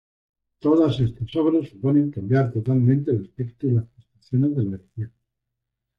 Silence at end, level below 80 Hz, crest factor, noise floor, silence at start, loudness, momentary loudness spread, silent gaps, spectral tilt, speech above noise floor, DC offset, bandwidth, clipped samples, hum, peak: 0.9 s; -54 dBFS; 14 dB; -81 dBFS; 0.65 s; -22 LUFS; 14 LU; none; -10 dB/octave; 60 dB; under 0.1%; 5.6 kHz; under 0.1%; none; -8 dBFS